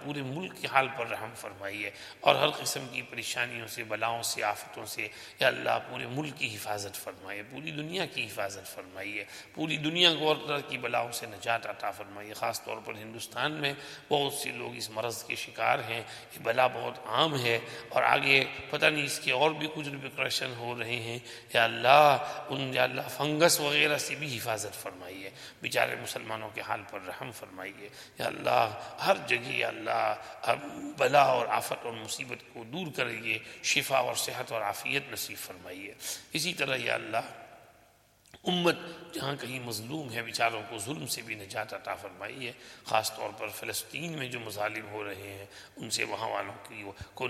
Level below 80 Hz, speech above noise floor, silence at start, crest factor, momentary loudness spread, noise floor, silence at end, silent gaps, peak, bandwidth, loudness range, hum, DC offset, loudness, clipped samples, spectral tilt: -72 dBFS; 31 dB; 0 s; 28 dB; 16 LU; -63 dBFS; 0 s; none; -4 dBFS; 16 kHz; 8 LU; none; under 0.1%; -30 LUFS; under 0.1%; -3 dB/octave